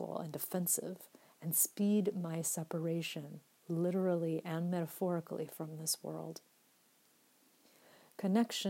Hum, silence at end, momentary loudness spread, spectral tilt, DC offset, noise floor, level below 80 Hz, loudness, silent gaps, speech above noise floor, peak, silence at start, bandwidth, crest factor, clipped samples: none; 0 s; 15 LU; -4.5 dB/octave; under 0.1%; -70 dBFS; under -90 dBFS; -37 LUFS; none; 34 dB; -18 dBFS; 0 s; 16 kHz; 20 dB; under 0.1%